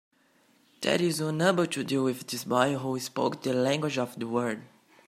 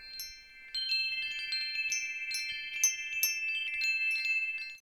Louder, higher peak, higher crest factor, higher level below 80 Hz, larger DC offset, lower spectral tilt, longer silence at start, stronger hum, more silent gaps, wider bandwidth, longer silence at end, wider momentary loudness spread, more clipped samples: first, -28 LUFS vs -31 LUFS; first, -8 dBFS vs -14 dBFS; about the same, 22 dB vs 20 dB; about the same, -74 dBFS vs -70 dBFS; neither; first, -5 dB/octave vs 5 dB/octave; first, 0.8 s vs 0 s; neither; neither; second, 16 kHz vs over 20 kHz; first, 0.4 s vs 0.05 s; about the same, 7 LU vs 9 LU; neither